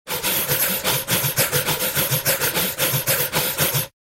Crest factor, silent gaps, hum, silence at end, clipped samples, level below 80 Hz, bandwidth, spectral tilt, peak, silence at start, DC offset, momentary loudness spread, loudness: 18 dB; none; none; 0.2 s; under 0.1%; -50 dBFS; 16 kHz; -2 dB/octave; -4 dBFS; 0.05 s; under 0.1%; 2 LU; -19 LUFS